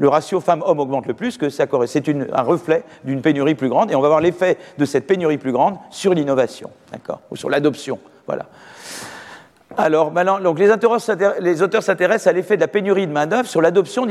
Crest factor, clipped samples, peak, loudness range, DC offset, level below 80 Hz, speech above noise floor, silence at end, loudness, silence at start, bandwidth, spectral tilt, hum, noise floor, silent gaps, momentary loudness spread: 16 dB; under 0.1%; -2 dBFS; 6 LU; under 0.1%; -64 dBFS; 24 dB; 0 s; -18 LUFS; 0 s; 13.5 kHz; -6 dB/octave; none; -41 dBFS; none; 15 LU